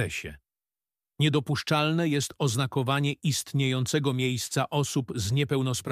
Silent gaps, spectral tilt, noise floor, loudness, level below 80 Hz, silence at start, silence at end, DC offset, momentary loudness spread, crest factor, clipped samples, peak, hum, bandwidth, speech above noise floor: none; -5 dB/octave; under -90 dBFS; -27 LUFS; -58 dBFS; 0 s; 0 s; under 0.1%; 4 LU; 16 dB; under 0.1%; -10 dBFS; none; 15.5 kHz; over 63 dB